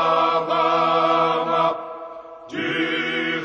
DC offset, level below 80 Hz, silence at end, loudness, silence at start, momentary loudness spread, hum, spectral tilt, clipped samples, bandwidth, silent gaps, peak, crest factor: under 0.1%; -70 dBFS; 0 s; -20 LUFS; 0 s; 16 LU; none; -5 dB/octave; under 0.1%; 9 kHz; none; -6 dBFS; 16 dB